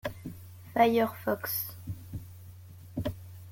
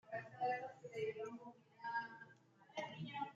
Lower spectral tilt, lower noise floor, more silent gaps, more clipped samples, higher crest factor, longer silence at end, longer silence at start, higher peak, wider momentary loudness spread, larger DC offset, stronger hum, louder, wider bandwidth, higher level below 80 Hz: about the same, -5.5 dB/octave vs -5.5 dB/octave; second, -48 dBFS vs -67 dBFS; neither; neither; first, 22 dB vs 16 dB; about the same, 0 s vs 0 s; about the same, 0.05 s vs 0.05 s; first, -10 dBFS vs -32 dBFS; first, 24 LU vs 15 LU; neither; neither; first, -31 LUFS vs -47 LUFS; first, 17 kHz vs 7.8 kHz; first, -56 dBFS vs -90 dBFS